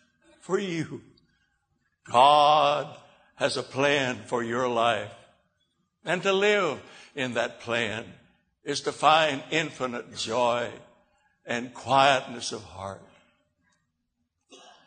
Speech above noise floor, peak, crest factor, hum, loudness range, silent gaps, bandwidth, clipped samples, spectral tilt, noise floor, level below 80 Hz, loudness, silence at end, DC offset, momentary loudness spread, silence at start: 53 dB; -4 dBFS; 22 dB; none; 5 LU; none; 9.6 kHz; under 0.1%; -3.5 dB/octave; -78 dBFS; -70 dBFS; -25 LUFS; 0.3 s; under 0.1%; 18 LU; 0.5 s